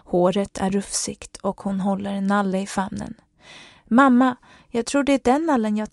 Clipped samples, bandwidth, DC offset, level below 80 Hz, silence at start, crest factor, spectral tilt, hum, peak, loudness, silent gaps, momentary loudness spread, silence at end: under 0.1%; 12 kHz; under 0.1%; -52 dBFS; 0.1 s; 18 dB; -5 dB/octave; none; -2 dBFS; -22 LUFS; none; 13 LU; 0.05 s